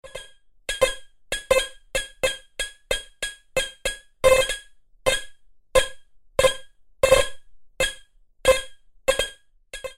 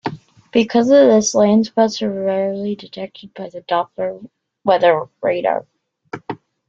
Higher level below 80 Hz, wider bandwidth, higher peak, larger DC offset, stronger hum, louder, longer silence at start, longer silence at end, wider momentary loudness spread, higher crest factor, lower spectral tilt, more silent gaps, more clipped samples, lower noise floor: first, -40 dBFS vs -60 dBFS; first, 16 kHz vs 7.8 kHz; about the same, -4 dBFS vs -2 dBFS; neither; neither; second, -24 LUFS vs -16 LUFS; about the same, 0.05 s vs 0.05 s; second, 0.05 s vs 0.35 s; second, 15 LU vs 19 LU; first, 22 dB vs 16 dB; second, -1.5 dB/octave vs -4.5 dB/octave; neither; neither; first, -51 dBFS vs -35 dBFS